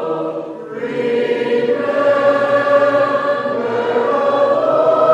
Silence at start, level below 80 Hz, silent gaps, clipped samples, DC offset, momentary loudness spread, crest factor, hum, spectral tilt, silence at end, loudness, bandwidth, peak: 0 s; -68 dBFS; none; under 0.1%; under 0.1%; 9 LU; 14 dB; none; -6 dB/octave; 0 s; -15 LUFS; 8.4 kHz; 0 dBFS